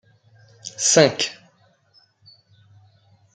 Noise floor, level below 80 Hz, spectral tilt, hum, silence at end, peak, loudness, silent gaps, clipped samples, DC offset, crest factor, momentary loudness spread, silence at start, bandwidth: -60 dBFS; -70 dBFS; -2.5 dB/octave; none; 2 s; -2 dBFS; -18 LUFS; none; under 0.1%; under 0.1%; 24 dB; 22 LU; 0.65 s; 10.5 kHz